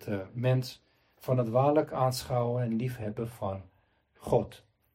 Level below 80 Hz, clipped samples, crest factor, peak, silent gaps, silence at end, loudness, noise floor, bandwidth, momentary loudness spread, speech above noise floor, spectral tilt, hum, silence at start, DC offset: -60 dBFS; under 0.1%; 18 dB; -12 dBFS; none; 0.4 s; -30 LUFS; -67 dBFS; 16 kHz; 16 LU; 37 dB; -7 dB/octave; none; 0 s; under 0.1%